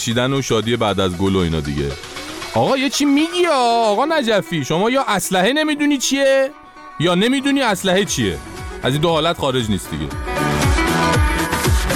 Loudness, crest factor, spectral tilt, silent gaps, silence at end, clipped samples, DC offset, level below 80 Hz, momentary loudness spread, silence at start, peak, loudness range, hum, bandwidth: -17 LUFS; 12 dB; -4.5 dB/octave; none; 0 s; under 0.1%; under 0.1%; -30 dBFS; 8 LU; 0 s; -4 dBFS; 2 LU; none; 19.5 kHz